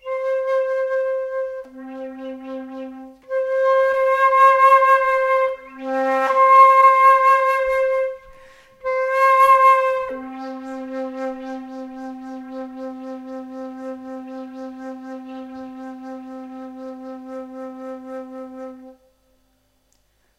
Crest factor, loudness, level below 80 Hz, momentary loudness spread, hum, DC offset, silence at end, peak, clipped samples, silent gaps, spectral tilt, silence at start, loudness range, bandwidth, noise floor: 18 dB; -16 LUFS; -60 dBFS; 22 LU; none; under 0.1%; 1.5 s; -2 dBFS; under 0.1%; none; -3.5 dB/octave; 0.05 s; 20 LU; 13.5 kHz; -63 dBFS